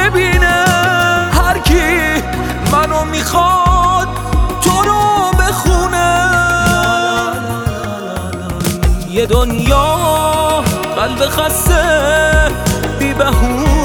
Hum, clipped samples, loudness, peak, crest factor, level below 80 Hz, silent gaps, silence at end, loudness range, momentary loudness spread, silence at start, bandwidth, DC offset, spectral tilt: none; under 0.1%; -13 LUFS; 0 dBFS; 12 dB; -20 dBFS; none; 0 s; 3 LU; 7 LU; 0 s; 19.5 kHz; under 0.1%; -4.5 dB/octave